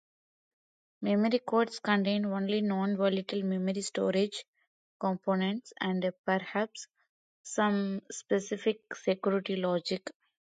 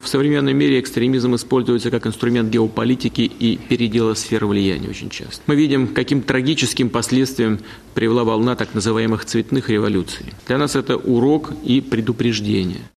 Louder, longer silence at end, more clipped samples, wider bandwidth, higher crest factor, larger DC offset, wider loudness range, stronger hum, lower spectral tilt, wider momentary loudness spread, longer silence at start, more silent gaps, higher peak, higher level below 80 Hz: second, -31 LUFS vs -18 LUFS; first, 0.35 s vs 0.1 s; neither; second, 9.4 kHz vs 14 kHz; about the same, 18 dB vs 16 dB; neither; about the same, 3 LU vs 1 LU; neither; about the same, -5.5 dB/octave vs -5.5 dB/octave; first, 9 LU vs 5 LU; first, 1 s vs 0 s; first, 4.48-4.53 s, 4.67-5.00 s, 6.19-6.24 s, 7.09-7.44 s vs none; second, -14 dBFS vs -2 dBFS; second, -80 dBFS vs -46 dBFS